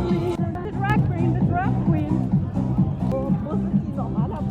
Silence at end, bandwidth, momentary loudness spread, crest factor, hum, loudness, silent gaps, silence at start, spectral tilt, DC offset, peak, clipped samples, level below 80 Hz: 0 s; 7.6 kHz; 4 LU; 14 dB; none; -23 LUFS; none; 0 s; -9.5 dB/octave; under 0.1%; -8 dBFS; under 0.1%; -36 dBFS